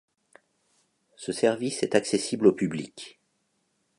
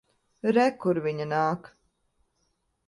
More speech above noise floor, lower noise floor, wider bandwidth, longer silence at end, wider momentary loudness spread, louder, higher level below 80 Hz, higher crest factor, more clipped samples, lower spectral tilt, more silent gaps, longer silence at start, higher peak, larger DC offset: about the same, 48 dB vs 48 dB; about the same, -74 dBFS vs -74 dBFS; about the same, 11.5 kHz vs 11.5 kHz; second, 0.9 s vs 1.3 s; first, 18 LU vs 7 LU; about the same, -26 LUFS vs -26 LUFS; about the same, -70 dBFS vs -70 dBFS; about the same, 24 dB vs 20 dB; neither; second, -4.5 dB/octave vs -7 dB/octave; neither; first, 1.2 s vs 0.45 s; first, -6 dBFS vs -10 dBFS; neither